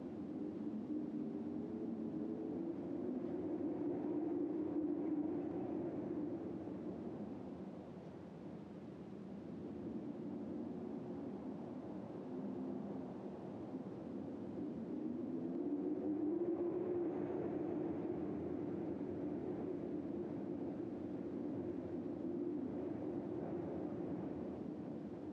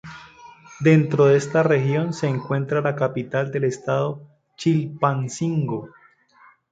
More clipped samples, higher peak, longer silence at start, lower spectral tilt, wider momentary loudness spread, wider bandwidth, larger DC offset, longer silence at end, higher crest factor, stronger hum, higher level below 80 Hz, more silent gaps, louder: neither; second, -30 dBFS vs -4 dBFS; about the same, 0 s vs 0.05 s; first, -10 dB/octave vs -7 dB/octave; second, 8 LU vs 11 LU; second, 6.2 kHz vs 9 kHz; neither; second, 0 s vs 0.85 s; second, 12 dB vs 18 dB; neither; second, -74 dBFS vs -62 dBFS; neither; second, -44 LUFS vs -21 LUFS